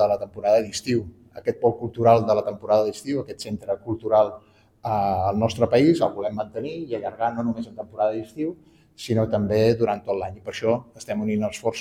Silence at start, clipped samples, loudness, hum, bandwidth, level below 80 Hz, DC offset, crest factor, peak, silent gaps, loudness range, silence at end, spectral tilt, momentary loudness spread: 0 s; under 0.1%; -24 LUFS; none; 15.5 kHz; -56 dBFS; under 0.1%; 18 dB; -4 dBFS; none; 3 LU; 0 s; -6.5 dB/octave; 12 LU